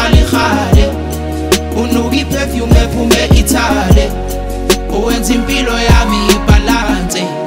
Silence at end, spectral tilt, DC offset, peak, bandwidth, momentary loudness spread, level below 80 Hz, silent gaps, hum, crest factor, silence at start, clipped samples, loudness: 0 s; -5 dB/octave; under 0.1%; 0 dBFS; 16.5 kHz; 7 LU; -16 dBFS; none; none; 10 dB; 0 s; under 0.1%; -12 LUFS